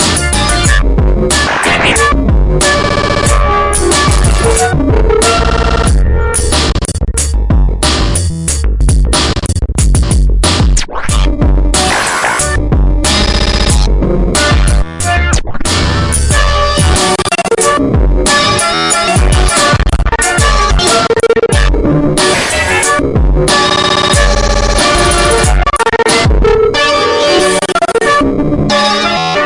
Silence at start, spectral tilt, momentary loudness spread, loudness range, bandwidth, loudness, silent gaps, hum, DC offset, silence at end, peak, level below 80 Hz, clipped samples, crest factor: 0 s; -4 dB/octave; 4 LU; 2 LU; 11.5 kHz; -10 LUFS; none; none; under 0.1%; 0 s; 0 dBFS; -14 dBFS; under 0.1%; 8 dB